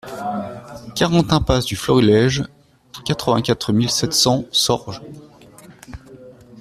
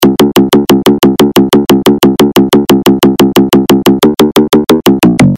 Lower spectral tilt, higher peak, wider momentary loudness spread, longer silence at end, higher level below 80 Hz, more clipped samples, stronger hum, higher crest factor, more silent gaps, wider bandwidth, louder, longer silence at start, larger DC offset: about the same, -4.5 dB/octave vs -5.5 dB/octave; about the same, -2 dBFS vs 0 dBFS; first, 23 LU vs 1 LU; about the same, 0 s vs 0 s; second, -40 dBFS vs -34 dBFS; second, under 0.1% vs 4%; neither; first, 18 dB vs 6 dB; neither; about the same, 15.5 kHz vs 16.5 kHz; second, -18 LUFS vs -7 LUFS; about the same, 0.05 s vs 0 s; second, under 0.1% vs 0.2%